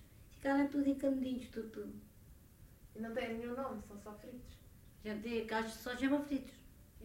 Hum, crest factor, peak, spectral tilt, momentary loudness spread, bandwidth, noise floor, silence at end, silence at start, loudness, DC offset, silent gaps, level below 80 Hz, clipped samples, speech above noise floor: none; 18 dB; -22 dBFS; -5.5 dB/octave; 21 LU; 16 kHz; -60 dBFS; 0 s; 0 s; -39 LUFS; under 0.1%; none; -62 dBFS; under 0.1%; 21 dB